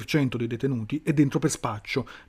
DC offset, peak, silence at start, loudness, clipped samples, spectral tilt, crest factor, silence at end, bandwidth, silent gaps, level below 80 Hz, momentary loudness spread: under 0.1%; -10 dBFS; 0 s; -26 LUFS; under 0.1%; -6 dB/octave; 16 dB; 0.05 s; 15.5 kHz; none; -54 dBFS; 7 LU